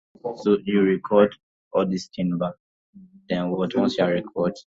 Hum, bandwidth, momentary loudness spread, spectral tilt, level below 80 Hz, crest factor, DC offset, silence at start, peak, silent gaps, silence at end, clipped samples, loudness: none; 7.8 kHz; 8 LU; -7 dB/octave; -60 dBFS; 20 dB; under 0.1%; 0.25 s; -4 dBFS; 1.43-1.71 s, 2.60-2.93 s; 0.05 s; under 0.1%; -23 LUFS